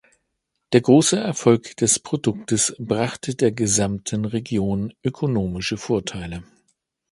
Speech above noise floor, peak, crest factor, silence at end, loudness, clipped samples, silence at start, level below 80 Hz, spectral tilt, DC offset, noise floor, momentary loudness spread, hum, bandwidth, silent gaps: 56 dB; 0 dBFS; 20 dB; 0.7 s; -21 LUFS; under 0.1%; 0.7 s; -48 dBFS; -4.5 dB/octave; under 0.1%; -76 dBFS; 10 LU; none; 11.5 kHz; none